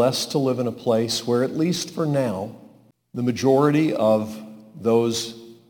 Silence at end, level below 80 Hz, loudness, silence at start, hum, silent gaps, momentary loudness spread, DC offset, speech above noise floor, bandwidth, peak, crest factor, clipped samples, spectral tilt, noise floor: 0.15 s; -64 dBFS; -22 LUFS; 0 s; none; none; 14 LU; under 0.1%; 31 dB; 19 kHz; -6 dBFS; 16 dB; under 0.1%; -5.5 dB/octave; -52 dBFS